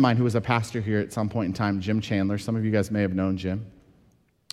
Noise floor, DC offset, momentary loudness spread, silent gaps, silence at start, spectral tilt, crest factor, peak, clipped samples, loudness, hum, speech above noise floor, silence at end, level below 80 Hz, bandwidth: -62 dBFS; under 0.1%; 5 LU; none; 0 s; -7 dB/octave; 18 dB; -8 dBFS; under 0.1%; -26 LUFS; none; 38 dB; 0.85 s; -56 dBFS; 13 kHz